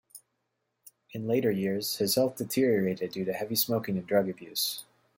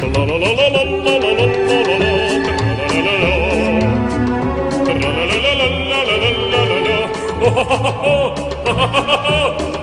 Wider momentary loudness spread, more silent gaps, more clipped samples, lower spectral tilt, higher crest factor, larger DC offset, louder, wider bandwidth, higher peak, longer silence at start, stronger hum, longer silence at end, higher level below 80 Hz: first, 7 LU vs 4 LU; neither; neither; about the same, -4.5 dB/octave vs -5 dB/octave; about the same, 18 dB vs 14 dB; neither; second, -29 LUFS vs -15 LUFS; first, 16.5 kHz vs 11 kHz; second, -12 dBFS vs 0 dBFS; first, 0.15 s vs 0 s; neither; first, 0.35 s vs 0 s; second, -70 dBFS vs -30 dBFS